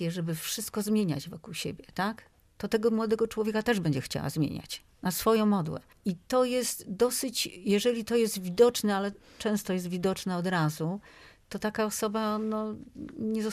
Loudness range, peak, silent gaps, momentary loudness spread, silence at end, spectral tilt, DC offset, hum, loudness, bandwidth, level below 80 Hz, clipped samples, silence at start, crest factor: 4 LU; -10 dBFS; none; 11 LU; 0 s; -5 dB/octave; under 0.1%; none; -30 LUFS; 15.5 kHz; -60 dBFS; under 0.1%; 0 s; 20 dB